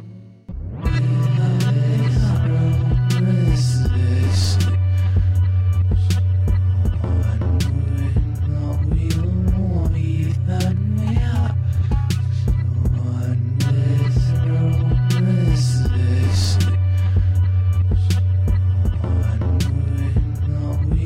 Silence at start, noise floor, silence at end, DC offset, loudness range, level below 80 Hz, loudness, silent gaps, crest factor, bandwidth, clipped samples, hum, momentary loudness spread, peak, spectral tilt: 0 s; -38 dBFS; 0 s; under 0.1%; 2 LU; -26 dBFS; -19 LUFS; none; 10 dB; 12 kHz; under 0.1%; none; 3 LU; -6 dBFS; -7 dB/octave